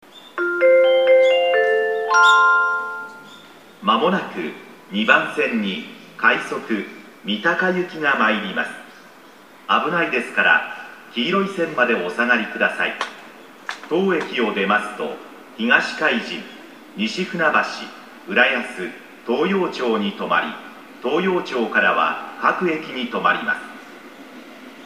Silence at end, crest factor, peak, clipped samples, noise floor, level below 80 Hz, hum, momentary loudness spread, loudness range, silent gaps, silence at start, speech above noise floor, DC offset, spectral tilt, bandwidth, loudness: 0 s; 20 dB; 0 dBFS; under 0.1%; -45 dBFS; -74 dBFS; none; 20 LU; 5 LU; none; 0.15 s; 25 dB; 0.1%; -4.5 dB/octave; 15 kHz; -19 LUFS